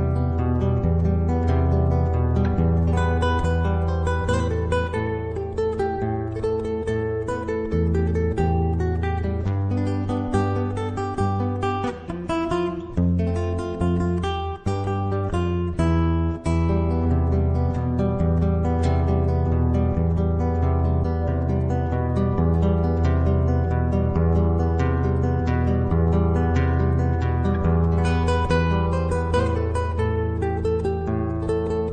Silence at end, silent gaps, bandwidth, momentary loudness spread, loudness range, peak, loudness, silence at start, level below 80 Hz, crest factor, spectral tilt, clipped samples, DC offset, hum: 0 s; none; 9 kHz; 5 LU; 3 LU; -8 dBFS; -23 LUFS; 0 s; -28 dBFS; 14 dB; -8.5 dB/octave; under 0.1%; under 0.1%; none